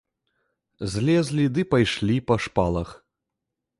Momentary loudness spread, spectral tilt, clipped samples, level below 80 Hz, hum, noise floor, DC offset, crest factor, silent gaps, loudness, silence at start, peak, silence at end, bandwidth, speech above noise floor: 9 LU; -6.5 dB/octave; under 0.1%; -44 dBFS; none; -84 dBFS; under 0.1%; 18 dB; none; -23 LUFS; 0.8 s; -6 dBFS; 0.85 s; 11.5 kHz; 61 dB